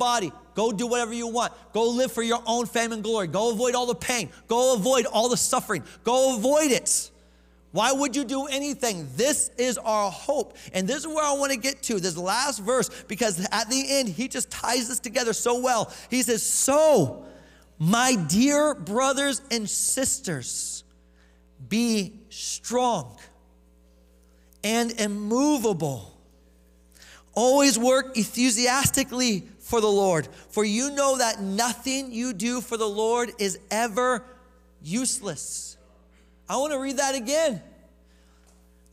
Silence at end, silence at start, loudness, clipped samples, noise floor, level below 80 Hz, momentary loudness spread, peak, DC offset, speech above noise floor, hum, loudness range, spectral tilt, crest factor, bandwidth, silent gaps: 1.25 s; 0 s; -24 LUFS; under 0.1%; -57 dBFS; -56 dBFS; 9 LU; -6 dBFS; under 0.1%; 32 dB; none; 6 LU; -3 dB/octave; 20 dB; 16 kHz; none